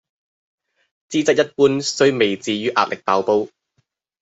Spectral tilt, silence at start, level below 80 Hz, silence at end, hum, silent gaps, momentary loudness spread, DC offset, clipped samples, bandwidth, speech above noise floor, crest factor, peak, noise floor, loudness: -4 dB/octave; 1.1 s; -64 dBFS; 0.75 s; none; none; 5 LU; under 0.1%; under 0.1%; 8 kHz; 51 dB; 18 dB; -2 dBFS; -69 dBFS; -18 LUFS